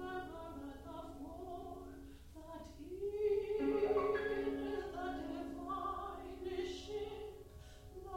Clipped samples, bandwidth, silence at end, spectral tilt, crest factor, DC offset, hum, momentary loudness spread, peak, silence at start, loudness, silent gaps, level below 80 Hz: under 0.1%; 16 kHz; 0 s; -6 dB/octave; 18 dB; under 0.1%; none; 18 LU; -24 dBFS; 0 s; -42 LUFS; none; -58 dBFS